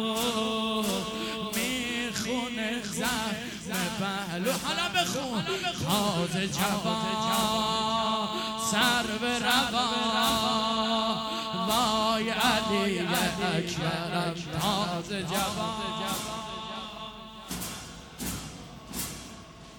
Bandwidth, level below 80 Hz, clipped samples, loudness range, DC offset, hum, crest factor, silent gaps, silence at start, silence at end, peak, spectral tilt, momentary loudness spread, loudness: 19 kHz; -54 dBFS; under 0.1%; 7 LU; under 0.1%; none; 18 dB; none; 0 s; 0 s; -10 dBFS; -3.5 dB/octave; 12 LU; -28 LUFS